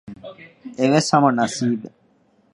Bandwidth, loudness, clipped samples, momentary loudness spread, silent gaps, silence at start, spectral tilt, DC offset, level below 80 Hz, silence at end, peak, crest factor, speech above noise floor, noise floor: 11.5 kHz; -19 LUFS; under 0.1%; 23 LU; none; 0.1 s; -5 dB/octave; under 0.1%; -64 dBFS; 0.65 s; 0 dBFS; 20 dB; 40 dB; -59 dBFS